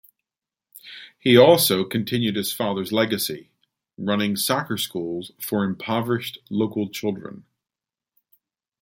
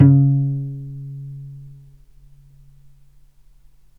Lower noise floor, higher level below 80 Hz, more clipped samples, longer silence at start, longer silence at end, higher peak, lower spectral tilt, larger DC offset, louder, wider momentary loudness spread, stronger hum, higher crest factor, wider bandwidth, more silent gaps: first, -90 dBFS vs -48 dBFS; second, -64 dBFS vs -50 dBFS; neither; first, 0.85 s vs 0 s; second, 1.4 s vs 2.3 s; about the same, 0 dBFS vs 0 dBFS; second, -4.5 dB/octave vs -12.5 dB/octave; neither; about the same, -22 LUFS vs -20 LUFS; second, 16 LU vs 25 LU; neither; about the same, 22 dB vs 20 dB; first, 17 kHz vs 2.1 kHz; neither